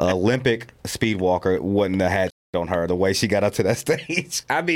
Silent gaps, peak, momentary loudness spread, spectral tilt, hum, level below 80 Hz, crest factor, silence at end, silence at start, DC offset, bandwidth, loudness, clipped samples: 2.32-2.53 s; -4 dBFS; 5 LU; -5 dB/octave; none; -50 dBFS; 16 dB; 0 s; 0 s; under 0.1%; 17 kHz; -22 LUFS; under 0.1%